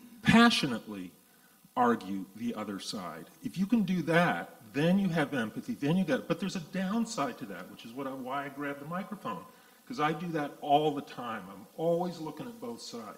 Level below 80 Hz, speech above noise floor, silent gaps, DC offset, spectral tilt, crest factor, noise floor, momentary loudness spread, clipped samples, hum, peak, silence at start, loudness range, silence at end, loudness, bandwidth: -64 dBFS; 30 dB; none; under 0.1%; -5.5 dB/octave; 24 dB; -61 dBFS; 15 LU; under 0.1%; none; -8 dBFS; 0 s; 7 LU; 0 s; -31 LUFS; 16 kHz